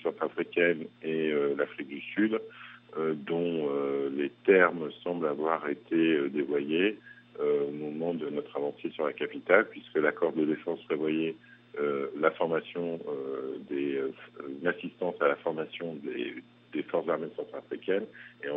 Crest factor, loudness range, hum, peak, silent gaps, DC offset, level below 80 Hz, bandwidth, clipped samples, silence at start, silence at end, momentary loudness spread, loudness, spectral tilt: 24 dB; 5 LU; none; -6 dBFS; none; under 0.1%; -84 dBFS; 4 kHz; under 0.1%; 0 s; 0 s; 11 LU; -31 LUFS; -4 dB/octave